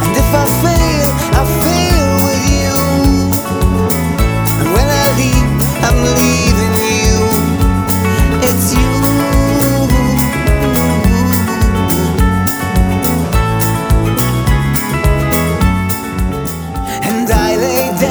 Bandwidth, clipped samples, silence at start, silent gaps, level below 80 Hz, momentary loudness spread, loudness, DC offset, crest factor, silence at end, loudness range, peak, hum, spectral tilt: over 20 kHz; under 0.1%; 0 s; none; -18 dBFS; 3 LU; -12 LUFS; under 0.1%; 12 dB; 0 s; 2 LU; 0 dBFS; none; -5 dB/octave